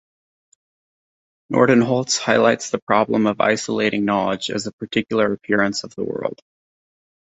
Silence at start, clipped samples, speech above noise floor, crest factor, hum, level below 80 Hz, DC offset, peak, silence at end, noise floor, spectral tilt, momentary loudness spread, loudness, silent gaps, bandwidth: 1.5 s; under 0.1%; over 71 dB; 18 dB; none; -60 dBFS; under 0.1%; -2 dBFS; 1.05 s; under -90 dBFS; -4.5 dB/octave; 10 LU; -19 LUFS; 2.82-2.87 s, 4.73-4.78 s; 8.2 kHz